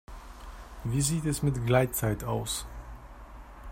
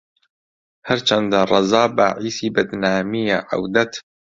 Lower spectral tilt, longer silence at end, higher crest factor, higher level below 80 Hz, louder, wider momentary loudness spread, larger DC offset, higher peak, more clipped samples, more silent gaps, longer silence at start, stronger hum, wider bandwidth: about the same, -5 dB/octave vs -4.5 dB/octave; second, 0 s vs 0.35 s; about the same, 20 dB vs 18 dB; first, -44 dBFS vs -56 dBFS; second, -29 LUFS vs -18 LUFS; first, 22 LU vs 8 LU; neither; second, -10 dBFS vs -2 dBFS; neither; neither; second, 0.1 s vs 0.85 s; neither; first, 16 kHz vs 7.8 kHz